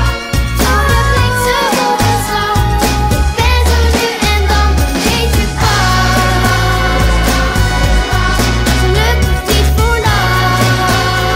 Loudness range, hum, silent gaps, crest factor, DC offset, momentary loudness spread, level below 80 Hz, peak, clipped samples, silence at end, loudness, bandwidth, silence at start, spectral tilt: 1 LU; none; none; 10 dB; under 0.1%; 2 LU; -16 dBFS; 0 dBFS; under 0.1%; 0 s; -12 LUFS; 16.5 kHz; 0 s; -4.5 dB/octave